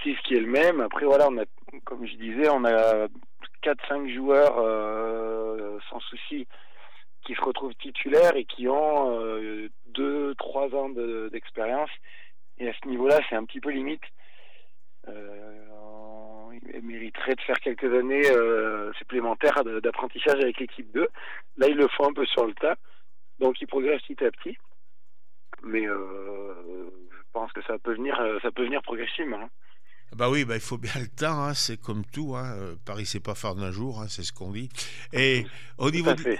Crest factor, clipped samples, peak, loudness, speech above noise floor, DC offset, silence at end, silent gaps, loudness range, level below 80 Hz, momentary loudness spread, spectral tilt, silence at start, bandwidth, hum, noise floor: 20 dB; under 0.1%; -6 dBFS; -26 LUFS; 54 dB; 2%; 0 s; none; 9 LU; -68 dBFS; 19 LU; -5 dB/octave; 0 s; 15 kHz; none; -81 dBFS